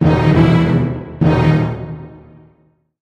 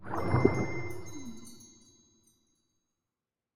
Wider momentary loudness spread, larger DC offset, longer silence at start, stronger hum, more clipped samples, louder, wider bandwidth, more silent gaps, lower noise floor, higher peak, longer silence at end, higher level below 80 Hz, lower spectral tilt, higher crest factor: second, 16 LU vs 23 LU; neither; about the same, 0 s vs 0 s; neither; neither; first, -14 LUFS vs -31 LUFS; second, 6.6 kHz vs 14 kHz; neither; second, -56 dBFS vs under -90 dBFS; first, 0 dBFS vs -8 dBFS; first, 0.85 s vs 0 s; first, -32 dBFS vs -54 dBFS; first, -9 dB/octave vs -7 dB/octave; second, 14 dB vs 28 dB